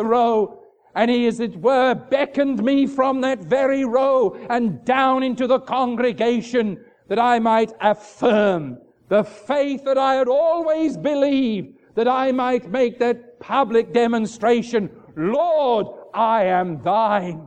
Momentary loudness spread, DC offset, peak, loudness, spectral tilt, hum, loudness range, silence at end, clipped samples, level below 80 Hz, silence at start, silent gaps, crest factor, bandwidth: 6 LU; under 0.1%; -4 dBFS; -20 LUFS; -6 dB/octave; none; 1 LU; 0 s; under 0.1%; -62 dBFS; 0 s; none; 16 dB; 9.2 kHz